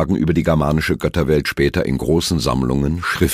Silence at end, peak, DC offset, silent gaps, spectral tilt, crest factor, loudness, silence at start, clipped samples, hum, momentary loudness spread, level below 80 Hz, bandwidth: 0 s; -2 dBFS; under 0.1%; none; -6 dB/octave; 16 dB; -18 LUFS; 0 s; under 0.1%; none; 3 LU; -30 dBFS; 15.5 kHz